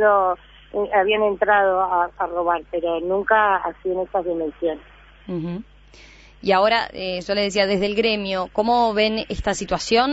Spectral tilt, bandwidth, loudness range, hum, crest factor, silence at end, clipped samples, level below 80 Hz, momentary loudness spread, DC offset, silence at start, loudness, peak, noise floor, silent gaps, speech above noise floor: -4.5 dB/octave; 8 kHz; 4 LU; none; 18 dB; 0 s; under 0.1%; -46 dBFS; 11 LU; under 0.1%; 0 s; -21 LUFS; -4 dBFS; -47 dBFS; none; 27 dB